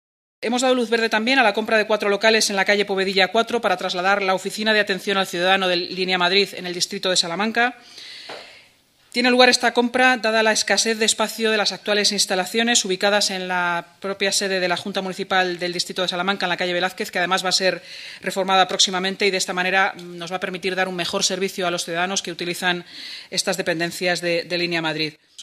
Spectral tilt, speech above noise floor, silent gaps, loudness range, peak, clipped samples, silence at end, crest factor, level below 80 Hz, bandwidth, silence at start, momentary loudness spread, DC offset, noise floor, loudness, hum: -2 dB/octave; 35 dB; none; 5 LU; 0 dBFS; under 0.1%; 0 s; 20 dB; -70 dBFS; 15.5 kHz; 0.4 s; 10 LU; under 0.1%; -56 dBFS; -20 LUFS; none